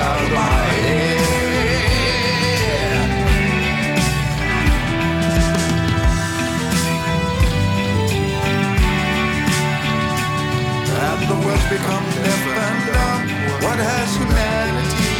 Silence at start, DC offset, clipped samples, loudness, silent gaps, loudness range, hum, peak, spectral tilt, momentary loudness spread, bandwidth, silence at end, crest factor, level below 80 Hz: 0 s; under 0.1%; under 0.1%; -18 LUFS; none; 2 LU; none; -4 dBFS; -5 dB/octave; 3 LU; 19 kHz; 0 s; 14 dB; -26 dBFS